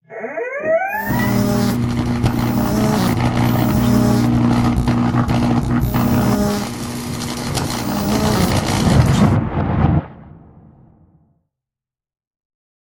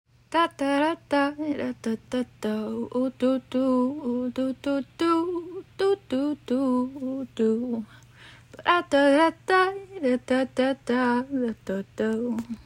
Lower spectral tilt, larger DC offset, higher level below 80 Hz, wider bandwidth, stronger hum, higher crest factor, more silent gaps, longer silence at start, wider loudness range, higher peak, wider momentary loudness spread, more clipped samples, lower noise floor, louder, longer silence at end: about the same, -6.5 dB/octave vs -5.5 dB/octave; neither; first, -30 dBFS vs -62 dBFS; about the same, 17 kHz vs 15.5 kHz; neither; about the same, 16 dB vs 18 dB; neither; second, 0.1 s vs 0.3 s; about the same, 3 LU vs 4 LU; first, 0 dBFS vs -8 dBFS; about the same, 8 LU vs 9 LU; neither; first, -89 dBFS vs -50 dBFS; first, -17 LUFS vs -26 LUFS; first, 2.5 s vs 0.05 s